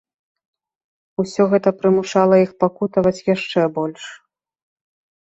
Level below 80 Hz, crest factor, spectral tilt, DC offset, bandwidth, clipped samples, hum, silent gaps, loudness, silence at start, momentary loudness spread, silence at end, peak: -58 dBFS; 18 dB; -6.5 dB/octave; under 0.1%; 8.2 kHz; under 0.1%; none; none; -18 LUFS; 1.2 s; 12 LU; 1.1 s; -2 dBFS